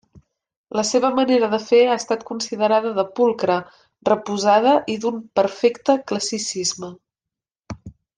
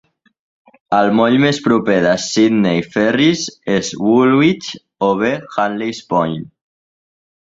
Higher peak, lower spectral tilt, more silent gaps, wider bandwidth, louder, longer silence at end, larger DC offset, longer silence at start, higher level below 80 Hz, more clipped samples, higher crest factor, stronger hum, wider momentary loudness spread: about the same, -4 dBFS vs -2 dBFS; second, -3.5 dB/octave vs -5 dB/octave; first, 7.59-7.63 s vs none; first, 10 kHz vs 7.8 kHz; second, -20 LUFS vs -15 LUFS; second, 0.25 s vs 1.15 s; neither; second, 0.75 s vs 0.9 s; second, -60 dBFS vs -54 dBFS; neither; about the same, 18 dB vs 14 dB; neither; first, 11 LU vs 8 LU